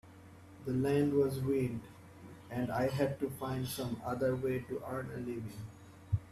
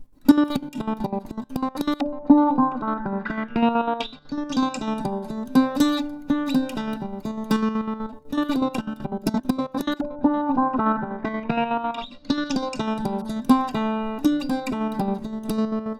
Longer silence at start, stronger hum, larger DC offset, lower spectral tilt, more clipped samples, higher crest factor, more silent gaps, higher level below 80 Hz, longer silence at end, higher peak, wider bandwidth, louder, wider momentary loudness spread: about the same, 0.05 s vs 0 s; neither; neither; about the same, -7 dB/octave vs -6 dB/octave; neither; about the same, 18 dB vs 22 dB; neither; second, -60 dBFS vs -50 dBFS; about the same, 0 s vs 0 s; second, -18 dBFS vs -2 dBFS; second, 14.5 kHz vs 16 kHz; second, -36 LUFS vs -24 LUFS; first, 22 LU vs 10 LU